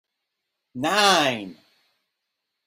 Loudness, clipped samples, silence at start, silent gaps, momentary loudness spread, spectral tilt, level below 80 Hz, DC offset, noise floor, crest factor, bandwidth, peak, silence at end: -20 LUFS; under 0.1%; 0.75 s; none; 23 LU; -2.5 dB/octave; -68 dBFS; under 0.1%; -81 dBFS; 22 dB; 16.5 kHz; -4 dBFS; 1.15 s